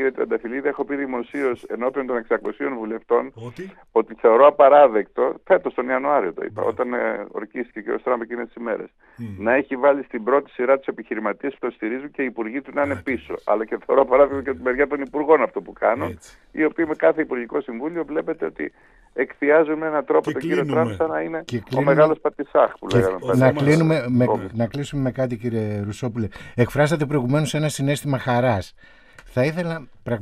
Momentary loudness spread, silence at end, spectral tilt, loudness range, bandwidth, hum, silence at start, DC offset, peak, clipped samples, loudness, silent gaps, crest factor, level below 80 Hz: 12 LU; 0 s; -7 dB/octave; 7 LU; 14.5 kHz; none; 0 s; under 0.1%; 0 dBFS; under 0.1%; -21 LUFS; none; 20 dB; -54 dBFS